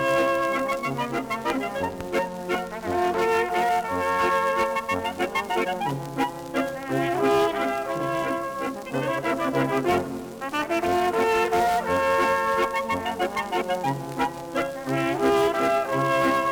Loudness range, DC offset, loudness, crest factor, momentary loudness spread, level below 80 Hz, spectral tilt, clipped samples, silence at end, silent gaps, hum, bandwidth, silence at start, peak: 3 LU; under 0.1%; -25 LUFS; 18 dB; 7 LU; -54 dBFS; -5 dB/octave; under 0.1%; 0 s; none; none; over 20 kHz; 0 s; -8 dBFS